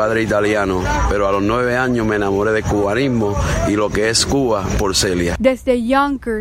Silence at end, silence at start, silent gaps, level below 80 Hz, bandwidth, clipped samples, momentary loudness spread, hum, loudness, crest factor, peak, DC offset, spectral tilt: 0 s; 0 s; none; -28 dBFS; 16 kHz; under 0.1%; 3 LU; none; -16 LUFS; 14 dB; -2 dBFS; under 0.1%; -4.5 dB/octave